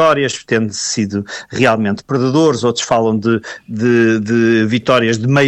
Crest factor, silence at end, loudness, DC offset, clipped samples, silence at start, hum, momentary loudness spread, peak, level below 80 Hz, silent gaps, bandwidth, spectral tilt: 12 dB; 0 s; -14 LUFS; under 0.1%; under 0.1%; 0 s; none; 6 LU; -2 dBFS; -54 dBFS; none; 10 kHz; -5 dB/octave